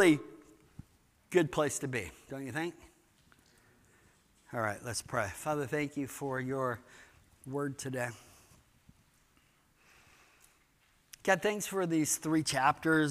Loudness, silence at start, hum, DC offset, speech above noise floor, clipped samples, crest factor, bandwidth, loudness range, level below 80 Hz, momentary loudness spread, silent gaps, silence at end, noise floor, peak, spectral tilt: -34 LUFS; 0 s; none; under 0.1%; 36 dB; under 0.1%; 24 dB; 15.5 kHz; 10 LU; -68 dBFS; 13 LU; none; 0 s; -69 dBFS; -12 dBFS; -4.5 dB/octave